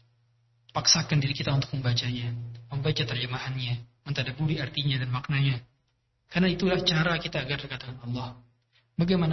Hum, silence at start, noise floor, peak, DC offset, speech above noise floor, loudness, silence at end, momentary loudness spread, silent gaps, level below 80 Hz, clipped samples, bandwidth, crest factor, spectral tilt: none; 0.75 s; -73 dBFS; -8 dBFS; under 0.1%; 46 dB; -28 LUFS; 0 s; 12 LU; none; -52 dBFS; under 0.1%; 6.2 kHz; 22 dB; -4.5 dB/octave